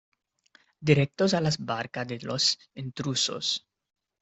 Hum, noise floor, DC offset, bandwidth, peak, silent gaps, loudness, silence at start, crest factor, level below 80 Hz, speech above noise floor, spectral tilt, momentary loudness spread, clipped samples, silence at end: none; -64 dBFS; under 0.1%; 8.4 kHz; -8 dBFS; none; -27 LUFS; 0.8 s; 22 dB; -62 dBFS; 36 dB; -4 dB/octave; 10 LU; under 0.1%; 0.65 s